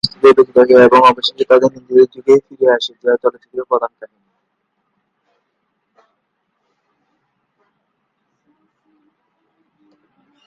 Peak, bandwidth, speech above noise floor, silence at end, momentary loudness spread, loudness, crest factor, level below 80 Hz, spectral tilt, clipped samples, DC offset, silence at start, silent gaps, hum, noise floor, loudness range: 0 dBFS; 9.4 kHz; 58 dB; 6.4 s; 11 LU; -12 LUFS; 16 dB; -58 dBFS; -5 dB/octave; under 0.1%; under 0.1%; 0.05 s; none; none; -69 dBFS; 16 LU